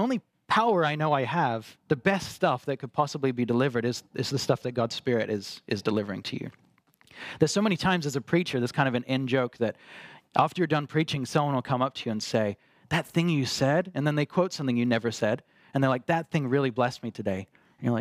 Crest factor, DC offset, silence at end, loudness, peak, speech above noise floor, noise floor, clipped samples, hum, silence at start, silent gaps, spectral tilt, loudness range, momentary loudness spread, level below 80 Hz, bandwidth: 20 dB; under 0.1%; 0 s; -27 LUFS; -8 dBFS; 32 dB; -59 dBFS; under 0.1%; none; 0 s; none; -5.5 dB/octave; 2 LU; 9 LU; -64 dBFS; 15.5 kHz